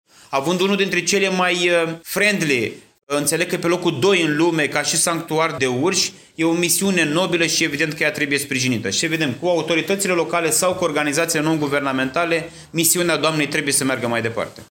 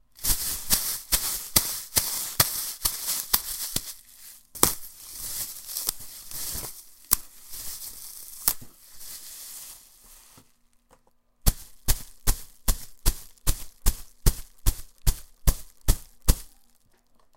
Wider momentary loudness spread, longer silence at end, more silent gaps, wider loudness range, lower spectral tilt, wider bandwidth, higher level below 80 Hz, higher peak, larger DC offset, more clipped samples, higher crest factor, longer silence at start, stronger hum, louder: second, 5 LU vs 16 LU; second, 0.05 s vs 0.9 s; first, 3.03-3.07 s vs none; second, 1 LU vs 9 LU; about the same, -3 dB/octave vs -2 dB/octave; about the same, 17 kHz vs 17 kHz; second, -60 dBFS vs -32 dBFS; about the same, -2 dBFS vs 0 dBFS; neither; neither; second, 16 dB vs 28 dB; about the same, 0.3 s vs 0.2 s; neither; first, -19 LUFS vs -27 LUFS